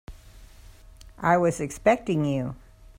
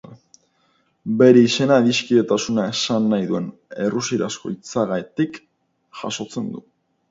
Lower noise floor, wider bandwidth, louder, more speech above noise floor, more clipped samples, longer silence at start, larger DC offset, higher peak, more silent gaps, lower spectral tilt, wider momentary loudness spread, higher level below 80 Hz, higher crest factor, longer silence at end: second, -48 dBFS vs -64 dBFS; first, 16 kHz vs 7.8 kHz; second, -25 LUFS vs -19 LUFS; second, 25 dB vs 45 dB; neither; about the same, 0.1 s vs 0.1 s; neither; second, -8 dBFS vs 0 dBFS; neither; first, -6.5 dB/octave vs -5 dB/octave; second, 11 LU vs 15 LU; first, -48 dBFS vs -62 dBFS; about the same, 18 dB vs 20 dB; about the same, 0.4 s vs 0.5 s